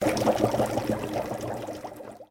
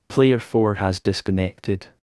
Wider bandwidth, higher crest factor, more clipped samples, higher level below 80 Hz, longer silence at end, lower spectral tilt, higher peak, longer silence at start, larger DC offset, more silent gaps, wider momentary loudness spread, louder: first, 19.5 kHz vs 12 kHz; about the same, 20 dB vs 16 dB; neither; about the same, -52 dBFS vs -56 dBFS; second, 0.05 s vs 0.25 s; about the same, -5.5 dB/octave vs -6.5 dB/octave; second, -8 dBFS vs -4 dBFS; about the same, 0 s vs 0.1 s; neither; neither; first, 15 LU vs 10 LU; second, -28 LUFS vs -22 LUFS